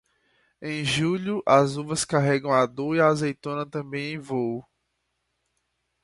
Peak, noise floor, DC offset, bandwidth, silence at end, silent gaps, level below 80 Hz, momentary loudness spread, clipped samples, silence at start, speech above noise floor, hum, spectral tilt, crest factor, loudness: -4 dBFS; -76 dBFS; under 0.1%; 11.5 kHz; 1.4 s; none; -62 dBFS; 11 LU; under 0.1%; 0.6 s; 52 dB; none; -5 dB/octave; 22 dB; -24 LUFS